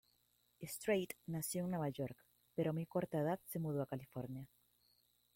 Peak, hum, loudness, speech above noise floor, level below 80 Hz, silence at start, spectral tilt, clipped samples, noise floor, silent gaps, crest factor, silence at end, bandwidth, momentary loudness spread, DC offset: -24 dBFS; 60 Hz at -70 dBFS; -42 LUFS; 37 dB; -76 dBFS; 0.6 s; -6 dB/octave; under 0.1%; -78 dBFS; none; 18 dB; 0.9 s; 16.5 kHz; 11 LU; under 0.1%